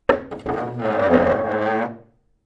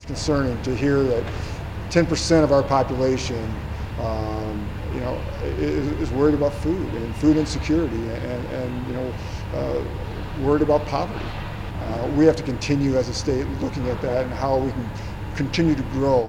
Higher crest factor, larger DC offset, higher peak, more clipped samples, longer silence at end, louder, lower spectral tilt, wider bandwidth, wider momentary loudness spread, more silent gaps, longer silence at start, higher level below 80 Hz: about the same, 20 dB vs 20 dB; neither; about the same, -2 dBFS vs -2 dBFS; neither; first, 0.5 s vs 0 s; about the same, -21 LUFS vs -23 LUFS; first, -8 dB/octave vs -6.5 dB/octave; second, 7.8 kHz vs 16 kHz; about the same, 10 LU vs 12 LU; neither; about the same, 0.1 s vs 0 s; second, -48 dBFS vs -34 dBFS